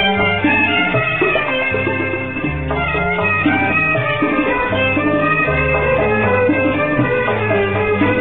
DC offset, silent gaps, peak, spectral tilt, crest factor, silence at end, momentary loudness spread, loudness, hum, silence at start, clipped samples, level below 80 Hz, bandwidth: 0.9%; none; -2 dBFS; -10 dB/octave; 14 dB; 0 s; 4 LU; -15 LUFS; none; 0 s; under 0.1%; -34 dBFS; 4.3 kHz